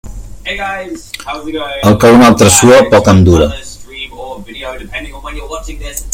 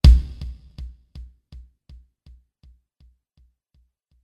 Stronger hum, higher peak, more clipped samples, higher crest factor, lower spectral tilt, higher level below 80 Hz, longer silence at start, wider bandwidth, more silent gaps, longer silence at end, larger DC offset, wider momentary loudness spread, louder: neither; about the same, 0 dBFS vs -2 dBFS; first, 0.7% vs under 0.1%; second, 10 dB vs 22 dB; second, -5 dB/octave vs -7 dB/octave; about the same, -28 dBFS vs -24 dBFS; about the same, 0.05 s vs 0.05 s; first, over 20 kHz vs 8.8 kHz; neither; second, 0 s vs 3.35 s; neither; second, 21 LU vs 28 LU; first, -7 LUFS vs -22 LUFS